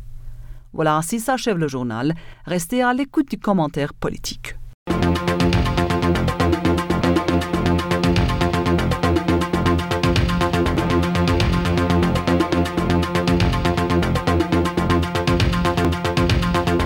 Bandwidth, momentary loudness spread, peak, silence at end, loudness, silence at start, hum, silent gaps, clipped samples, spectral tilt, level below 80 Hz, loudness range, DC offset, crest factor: 17 kHz; 5 LU; -6 dBFS; 0 s; -20 LUFS; 0 s; none; 4.74-4.86 s; under 0.1%; -6 dB/octave; -32 dBFS; 3 LU; under 0.1%; 12 dB